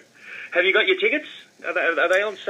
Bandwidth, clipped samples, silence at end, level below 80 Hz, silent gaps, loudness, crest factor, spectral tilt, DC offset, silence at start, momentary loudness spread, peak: 14 kHz; under 0.1%; 0 s; under -90 dBFS; none; -20 LUFS; 18 dB; -2.5 dB/octave; under 0.1%; 0.2 s; 19 LU; -4 dBFS